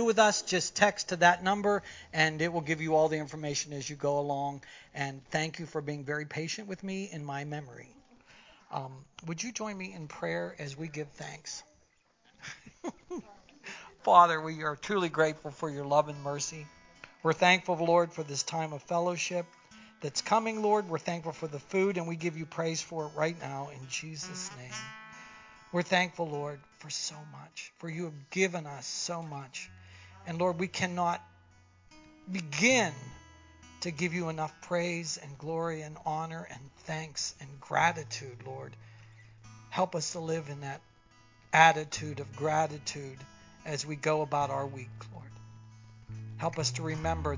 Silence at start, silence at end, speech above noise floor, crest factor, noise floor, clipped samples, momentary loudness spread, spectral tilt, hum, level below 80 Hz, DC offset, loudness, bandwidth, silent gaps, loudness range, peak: 0 s; 0 s; 36 dB; 26 dB; -68 dBFS; under 0.1%; 19 LU; -4 dB/octave; none; -60 dBFS; under 0.1%; -31 LUFS; 7.8 kHz; none; 10 LU; -6 dBFS